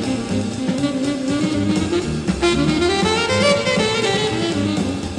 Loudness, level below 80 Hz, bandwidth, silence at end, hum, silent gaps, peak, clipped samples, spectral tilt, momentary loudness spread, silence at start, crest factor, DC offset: -19 LUFS; -38 dBFS; 12.5 kHz; 0 s; none; none; -4 dBFS; under 0.1%; -4.5 dB/octave; 6 LU; 0 s; 16 dB; under 0.1%